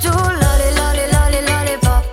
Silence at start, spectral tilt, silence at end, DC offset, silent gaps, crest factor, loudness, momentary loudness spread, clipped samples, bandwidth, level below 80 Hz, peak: 0 s; -4.5 dB/octave; 0 s; under 0.1%; none; 12 dB; -15 LUFS; 2 LU; under 0.1%; 17 kHz; -16 dBFS; -2 dBFS